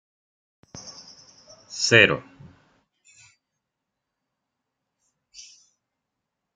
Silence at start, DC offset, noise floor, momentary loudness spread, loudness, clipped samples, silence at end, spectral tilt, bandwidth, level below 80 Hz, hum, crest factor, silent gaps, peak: 0.75 s; under 0.1%; -83 dBFS; 30 LU; -18 LUFS; under 0.1%; 1.15 s; -3 dB/octave; 10 kHz; -66 dBFS; none; 28 dB; none; -2 dBFS